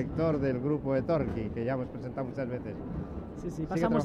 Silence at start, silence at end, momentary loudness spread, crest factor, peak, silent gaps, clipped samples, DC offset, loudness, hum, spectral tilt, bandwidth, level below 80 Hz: 0 s; 0 s; 10 LU; 16 dB; -14 dBFS; none; under 0.1%; under 0.1%; -32 LUFS; none; -8.5 dB/octave; 11.5 kHz; -48 dBFS